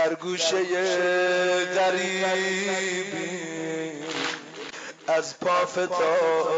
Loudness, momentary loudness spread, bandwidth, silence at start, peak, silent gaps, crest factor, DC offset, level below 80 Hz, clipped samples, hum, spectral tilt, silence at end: -25 LUFS; 9 LU; 10 kHz; 0 s; -12 dBFS; none; 12 dB; under 0.1%; -76 dBFS; under 0.1%; none; -3 dB/octave; 0 s